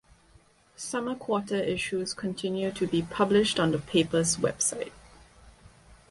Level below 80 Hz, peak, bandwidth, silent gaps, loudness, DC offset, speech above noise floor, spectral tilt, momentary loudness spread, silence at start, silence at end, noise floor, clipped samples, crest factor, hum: -56 dBFS; -10 dBFS; 11.5 kHz; none; -28 LUFS; under 0.1%; 32 dB; -4 dB/octave; 9 LU; 0.8 s; 0.15 s; -60 dBFS; under 0.1%; 18 dB; none